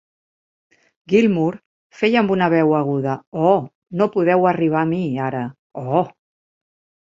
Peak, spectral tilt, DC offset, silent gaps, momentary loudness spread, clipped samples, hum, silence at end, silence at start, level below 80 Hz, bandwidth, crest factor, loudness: -2 dBFS; -8 dB/octave; under 0.1%; 1.66-1.90 s, 3.27-3.32 s, 3.75-3.82 s, 5.59-5.70 s; 12 LU; under 0.1%; none; 1.05 s; 1.1 s; -62 dBFS; 7.6 kHz; 18 dB; -19 LUFS